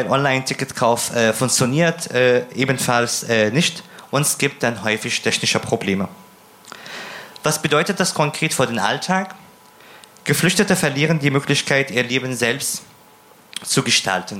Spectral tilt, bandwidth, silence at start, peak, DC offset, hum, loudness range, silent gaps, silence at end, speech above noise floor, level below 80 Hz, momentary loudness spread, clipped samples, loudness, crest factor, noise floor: -3.5 dB/octave; 16.5 kHz; 0 s; -2 dBFS; under 0.1%; none; 3 LU; none; 0 s; 30 dB; -60 dBFS; 10 LU; under 0.1%; -18 LUFS; 18 dB; -48 dBFS